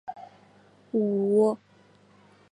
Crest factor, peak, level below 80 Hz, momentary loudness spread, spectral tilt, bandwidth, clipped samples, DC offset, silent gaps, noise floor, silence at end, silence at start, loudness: 18 dB; -12 dBFS; -78 dBFS; 19 LU; -9 dB/octave; 11 kHz; under 0.1%; under 0.1%; none; -58 dBFS; 0.95 s; 0.05 s; -26 LUFS